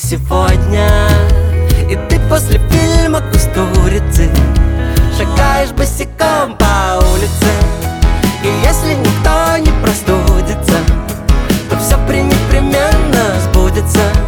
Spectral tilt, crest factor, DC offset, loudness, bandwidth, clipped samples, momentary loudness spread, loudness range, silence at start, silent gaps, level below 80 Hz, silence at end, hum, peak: -5.5 dB/octave; 10 dB; under 0.1%; -12 LUFS; 19 kHz; under 0.1%; 3 LU; 1 LU; 0 s; none; -14 dBFS; 0 s; none; 0 dBFS